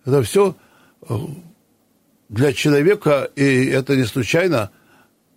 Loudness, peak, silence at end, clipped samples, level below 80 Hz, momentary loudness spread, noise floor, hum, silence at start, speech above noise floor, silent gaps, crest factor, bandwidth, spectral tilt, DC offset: -18 LUFS; -4 dBFS; 0.7 s; under 0.1%; -56 dBFS; 13 LU; -60 dBFS; none; 0.05 s; 43 dB; none; 14 dB; 16 kHz; -6 dB/octave; under 0.1%